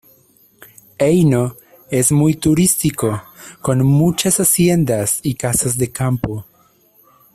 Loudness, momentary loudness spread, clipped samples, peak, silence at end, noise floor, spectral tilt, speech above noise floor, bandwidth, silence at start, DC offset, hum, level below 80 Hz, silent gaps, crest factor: -16 LUFS; 9 LU; under 0.1%; -2 dBFS; 0.9 s; -53 dBFS; -5 dB/octave; 38 dB; 16 kHz; 1 s; under 0.1%; none; -44 dBFS; none; 16 dB